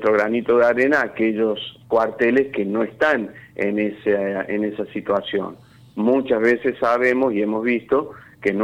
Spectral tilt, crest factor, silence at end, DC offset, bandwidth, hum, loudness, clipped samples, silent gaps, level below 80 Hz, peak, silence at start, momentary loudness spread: -6.5 dB/octave; 14 dB; 0 s; under 0.1%; 9.8 kHz; none; -20 LUFS; under 0.1%; none; -60 dBFS; -6 dBFS; 0 s; 8 LU